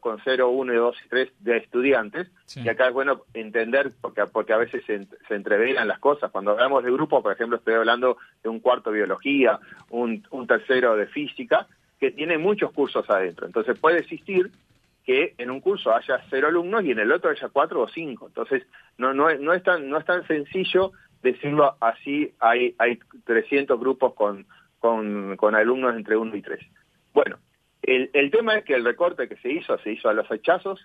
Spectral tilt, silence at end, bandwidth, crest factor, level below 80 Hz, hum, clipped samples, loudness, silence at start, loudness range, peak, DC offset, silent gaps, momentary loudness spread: -6.5 dB/octave; 0.1 s; 6.4 kHz; 18 dB; -72 dBFS; none; under 0.1%; -23 LUFS; 0.05 s; 2 LU; -4 dBFS; under 0.1%; none; 9 LU